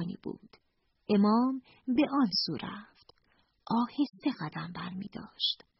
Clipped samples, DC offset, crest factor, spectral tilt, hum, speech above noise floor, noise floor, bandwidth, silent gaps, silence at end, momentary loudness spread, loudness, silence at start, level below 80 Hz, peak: under 0.1%; under 0.1%; 16 dB; -4 dB/octave; none; 44 dB; -75 dBFS; 6 kHz; none; 0.25 s; 17 LU; -31 LUFS; 0 s; -70 dBFS; -16 dBFS